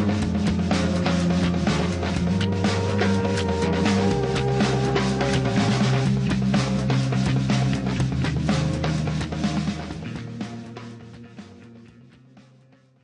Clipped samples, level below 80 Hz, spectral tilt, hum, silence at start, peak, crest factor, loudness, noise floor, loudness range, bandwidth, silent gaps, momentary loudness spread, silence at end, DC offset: under 0.1%; -38 dBFS; -6.5 dB/octave; none; 0 s; -8 dBFS; 16 dB; -23 LUFS; -55 dBFS; 9 LU; 10.5 kHz; none; 12 LU; 0.65 s; under 0.1%